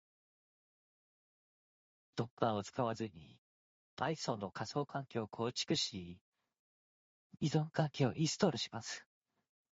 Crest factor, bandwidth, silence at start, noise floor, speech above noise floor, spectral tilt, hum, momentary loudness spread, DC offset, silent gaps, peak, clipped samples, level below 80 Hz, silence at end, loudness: 26 dB; 7.6 kHz; 2.15 s; under -90 dBFS; over 52 dB; -5 dB/octave; none; 11 LU; under 0.1%; 2.30-2.37 s, 3.38-3.97 s, 6.21-6.32 s, 6.59-7.30 s; -16 dBFS; under 0.1%; -76 dBFS; 0.8 s; -38 LUFS